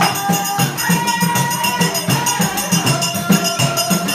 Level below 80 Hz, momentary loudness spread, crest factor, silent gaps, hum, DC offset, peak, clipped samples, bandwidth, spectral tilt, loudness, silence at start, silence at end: -52 dBFS; 2 LU; 14 dB; none; none; under 0.1%; -2 dBFS; under 0.1%; 16 kHz; -3.5 dB/octave; -16 LUFS; 0 s; 0 s